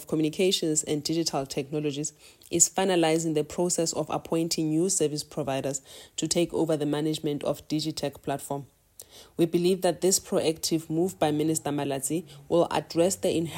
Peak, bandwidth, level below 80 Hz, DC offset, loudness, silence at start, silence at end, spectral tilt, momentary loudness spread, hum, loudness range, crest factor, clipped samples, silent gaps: -4 dBFS; 16.5 kHz; -62 dBFS; under 0.1%; -27 LUFS; 0 s; 0 s; -4 dB/octave; 9 LU; none; 4 LU; 22 dB; under 0.1%; none